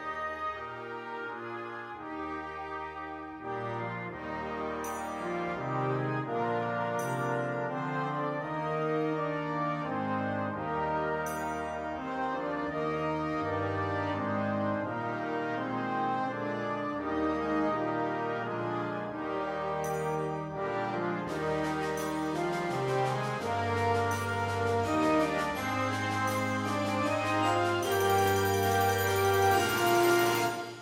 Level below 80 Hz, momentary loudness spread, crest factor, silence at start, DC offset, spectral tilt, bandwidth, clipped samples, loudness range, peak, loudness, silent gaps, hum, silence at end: -60 dBFS; 10 LU; 18 dB; 0 s; under 0.1%; -5 dB/octave; 16 kHz; under 0.1%; 8 LU; -14 dBFS; -31 LUFS; none; none; 0 s